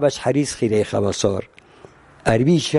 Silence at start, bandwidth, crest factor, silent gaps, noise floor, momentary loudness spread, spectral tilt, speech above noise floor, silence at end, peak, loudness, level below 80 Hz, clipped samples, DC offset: 0 s; 11.5 kHz; 16 dB; none; -47 dBFS; 6 LU; -5.5 dB/octave; 28 dB; 0 s; -4 dBFS; -20 LUFS; -46 dBFS; under 0.1%; under 0.1%